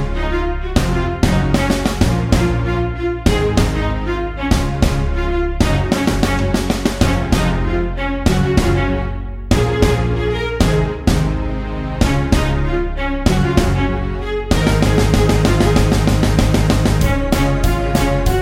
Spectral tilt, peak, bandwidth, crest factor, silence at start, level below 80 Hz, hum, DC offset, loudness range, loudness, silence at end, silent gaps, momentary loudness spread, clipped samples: -6 dB/octave; 0 dBFS; 16.5 kHz; 16 dB; 0 s; -20 dBFS; none; under 0.1%; 3 LU; -17 LUFS; 0 s; none; 6 LU; under 0.1%